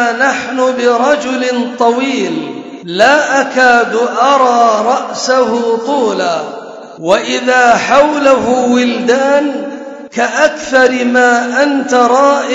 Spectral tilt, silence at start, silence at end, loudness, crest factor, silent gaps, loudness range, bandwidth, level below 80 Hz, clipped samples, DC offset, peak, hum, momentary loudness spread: -3 dB/octave; 0 s; 0 s; -11 LUFS; 10 dB; none; 2 LU; 8 kHz; -54 dBFS; 0.3%; under 0.1%; 0 dBFS; none; 11 LU